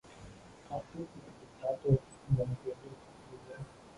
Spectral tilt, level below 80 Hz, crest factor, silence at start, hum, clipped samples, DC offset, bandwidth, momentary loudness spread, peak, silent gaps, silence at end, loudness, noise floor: -8.5 dB/octave; -58 dBFS; 22 dB; 0.05 s; none; under 0.1%; under 0.1%; 11 kHz; 22 LU; -16 dBFS; none; 0 s; -36 LUFS; -53 dBFS